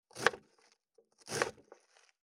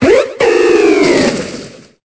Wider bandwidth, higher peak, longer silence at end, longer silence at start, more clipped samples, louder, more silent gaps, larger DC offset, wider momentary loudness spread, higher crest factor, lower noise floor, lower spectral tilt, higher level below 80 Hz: first, 18.5 kHz vs 8 kHz; second, -6 dBFS vs 0 dBFS; first, 0.65 s vs 0.4 s; first, 0.15 s vs 0 s; neither; second, -36 LUFS vs -10 LUFS; neither; neither; first, 21 LU vs 14 LU; first, 34 dB vs 10 dB; first, -71 dBFS vs -30 dBFS; second, -2 dB/octave vs -4.5 dB/octave; second, -72 dBFS vs -40 dBFS